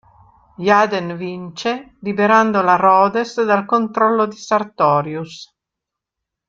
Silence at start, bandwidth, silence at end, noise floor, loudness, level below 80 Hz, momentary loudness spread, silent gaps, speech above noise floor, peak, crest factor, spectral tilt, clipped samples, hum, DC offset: 0.6 s; 7.8 kHz; 1.05 s; -83 dBFS; -16 LUFS; -62 dBFS; 14 LU; none; 67 dB; -2 dBFS; 16 dB; -5.5 dB/octave; under 0.1%; none; under 0.1%